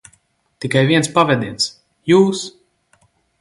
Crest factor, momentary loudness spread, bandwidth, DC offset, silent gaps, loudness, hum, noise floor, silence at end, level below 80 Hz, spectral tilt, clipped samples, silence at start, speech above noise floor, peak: 18 dB; 15 LU; 11.5 kHz; under 0.1%; none; -16 LUFS; none; -60 dBFS; 0.9 s; -56 dBFS; -5 dB/octave; under 0.1%; 0.6 s; 45 dB; 0 dBFS